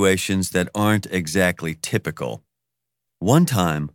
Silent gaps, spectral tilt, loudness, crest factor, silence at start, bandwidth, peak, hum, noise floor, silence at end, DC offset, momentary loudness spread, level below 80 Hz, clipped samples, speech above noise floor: none; -5 dB/octave; -21 LUFS; 20 dB; 0 s; 17.5 kHz; -2 dBFS; none; -83 dBFS; 0.05 s; under 0.1%; 11 LU; -52 dBFS; under 0.1%; 63 dB